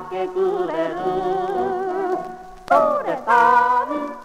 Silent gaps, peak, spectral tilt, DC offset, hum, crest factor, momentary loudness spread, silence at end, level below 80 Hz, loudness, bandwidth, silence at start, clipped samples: none; -2 dBFS; -5.5 dB/octave; under 0.1%; none; 18 dB; 11 LU; 0 s; -54 dBFS; -20 LUFS; 13.5 kHz; 0 s; under 0.1%